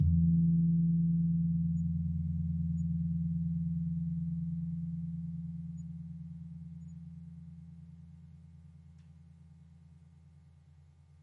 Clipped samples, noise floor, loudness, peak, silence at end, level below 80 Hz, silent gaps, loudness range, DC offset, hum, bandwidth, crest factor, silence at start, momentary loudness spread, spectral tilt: under 0.1%; -60 dBFS; -33 LUFS; -18 dBFS; 1.4 s; -54 dBFS; none; 22 LU; under 0.1%; none; 0.5 kHz; 16 dB; 0 s; 23 LU; -12 dB/octave